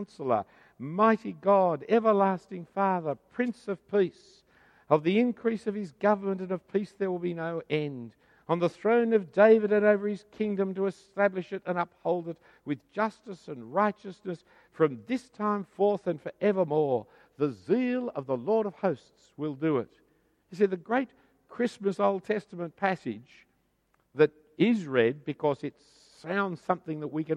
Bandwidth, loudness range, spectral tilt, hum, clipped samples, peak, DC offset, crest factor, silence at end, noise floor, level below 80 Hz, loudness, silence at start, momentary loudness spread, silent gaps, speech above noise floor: 9.8 kHz; 6 LU; -7.5 dB/octave; none; under 0.1%; -8 dBFS; under 0.1%; 22 dB; 0 s; -72 dBFS; -74 dBFS; -28 LUFS; 0 s; 13 LU; none; 44 dB